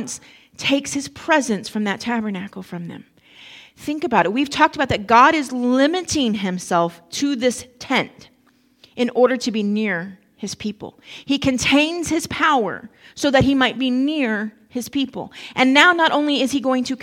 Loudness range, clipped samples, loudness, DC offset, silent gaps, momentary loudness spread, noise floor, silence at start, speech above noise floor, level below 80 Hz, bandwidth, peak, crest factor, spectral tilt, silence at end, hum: 5 LU; under 0.1%; -19 LUFS; under 0.1%; none; 17 LU; -58 dBFS; 0 s; 39 dB; -50 dBFS; 16 kHz; 0 dBFS; 20 dB; -4 dB/octave; 0 s; none